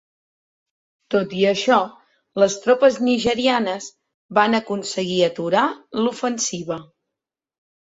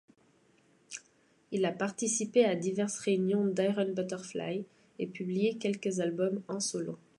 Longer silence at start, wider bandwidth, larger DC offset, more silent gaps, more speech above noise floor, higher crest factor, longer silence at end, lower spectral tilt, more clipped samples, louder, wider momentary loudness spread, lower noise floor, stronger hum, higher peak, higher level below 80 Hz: first, 1.1 s vs 0.9 s; second, 8 kHz vs 11.5 kHz; neither; first, 4.14-4.29 s vs none; first, 66 dB vs 36 dB; about the same, 20 dB vs 20 dB; first, 1.1 s vs 0.25 s; about the same, -4 dB/octave vs -4.5 dB/octave; neither; first, -20 LUFS vs -32 LUFS; about the same, 13 LU vs 12 LU; first, -85 dBFS vs -67 dBFS; neither; first, -2 dBFS vs -14 dBFS; first, -60 dBFS vs -80 dBFS